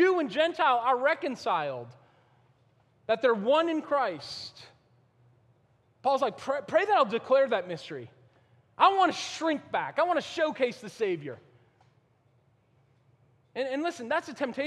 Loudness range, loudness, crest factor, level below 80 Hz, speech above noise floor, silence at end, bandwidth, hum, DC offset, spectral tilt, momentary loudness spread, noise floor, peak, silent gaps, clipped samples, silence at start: 9 LU; -28 LUFS; 22 dB; -78 dBFS; 39 dB; 0 s; 11.5 kHz; none; under 0.1%; -4.5 dB/octave; 15 LU; -66 dBFS; -8 dBFS; none; under 0.1%; 0 s